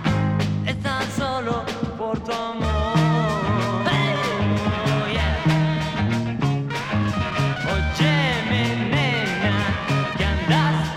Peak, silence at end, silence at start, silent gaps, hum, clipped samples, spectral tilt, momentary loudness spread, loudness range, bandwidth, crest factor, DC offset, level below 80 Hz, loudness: -6 dBFS; 0 s; 0 s; none; none; under 0.1%; -6 dB/octave; 6 LU; 2 LU; 13.5 kHz; 16 dB; under 0.1%; -34 dBFS; -22 LUFS